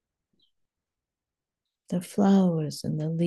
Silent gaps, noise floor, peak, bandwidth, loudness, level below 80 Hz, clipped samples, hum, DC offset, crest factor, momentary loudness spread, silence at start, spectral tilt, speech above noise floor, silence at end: none; -89 dBFS; -10 dBFS; 12.5 kHz; -26 LUFS; -72 dBFS; under 0.1%; none; under 0.1%; 18 dB; 12 LU; 1.9 s; -7.5 dB/octave; 65 dB; 0 s